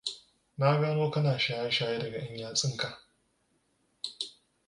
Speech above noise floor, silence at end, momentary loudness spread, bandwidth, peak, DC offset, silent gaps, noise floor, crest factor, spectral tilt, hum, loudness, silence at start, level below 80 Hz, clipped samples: 44 dB; 0.4 s; 13 LU; 11.5 kHz; -10 dBFS; under 0.1%; none; -73 dBFS; 22 dB; -4.5 dB/octave; none; -31 LUFS; 0.05 s; -70 dBFS; under 0.1%